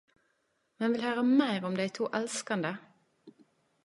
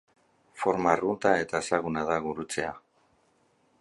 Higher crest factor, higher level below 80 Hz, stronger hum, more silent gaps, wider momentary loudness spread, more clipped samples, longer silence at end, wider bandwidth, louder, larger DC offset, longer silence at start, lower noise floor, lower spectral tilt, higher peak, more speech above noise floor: about the same, 20 dB vs 22 dB; second, -82 dBFS vs -60 dBFS; neither; neither; about the same, 8 LU vs 8 LU; neither; second, 0.55 s vs 1 s; about the same, 11.5 kHz vs 11.5 kHz; second, -31 LUFS vs -28 LUFS; neither; first, 0.8 s vs 0.55 s; first, -76 dBFS vs -68 dBFS; about the same, -4.5 dB/octave vs -4.5 dB/octave; second, -12 dBFS vs -6 dBFS; first, 46 dB vs 40 dB